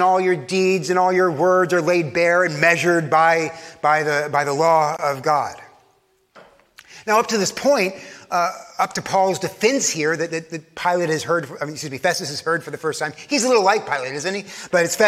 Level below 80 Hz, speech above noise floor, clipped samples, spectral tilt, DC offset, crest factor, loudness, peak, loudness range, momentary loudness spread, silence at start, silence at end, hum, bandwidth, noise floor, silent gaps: -66 dBFS; 42 dB; under 0.1%; -3.5 dB/octave; under 0.1%; 18 dB; -19 LUFS; -2 dBFS; 5 LU; 10 LU; 0 s; 0 s; none; 15.5 kHz; -61 dBFS; none